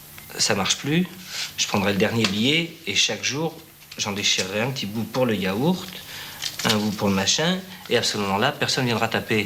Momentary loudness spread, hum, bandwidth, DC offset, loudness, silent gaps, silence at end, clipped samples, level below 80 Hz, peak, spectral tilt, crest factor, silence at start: 9 LU; none; 18.5 kHz; under 0.1%; -22 LUFS; none; 0 s; under 0.1%; -58 dBFS; -2 dBFS; -3.5 dB/octave; 22 dB; 0 s